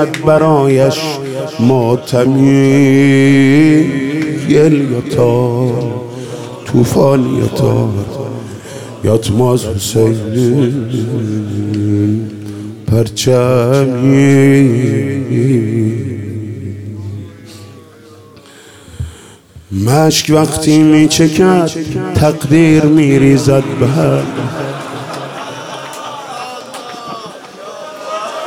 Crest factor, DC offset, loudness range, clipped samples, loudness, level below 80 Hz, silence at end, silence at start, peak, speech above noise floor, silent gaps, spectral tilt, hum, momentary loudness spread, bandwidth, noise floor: 12 dB; under 0.1%; 13 LU; under 0.1%; -11 LUFS; -44 dBFS; 0 s; 0 s; 0 dBFS; 28 dB; none; -6.5 dB/octave; none; 17 LU; 16.5 kHz; -38 dBFS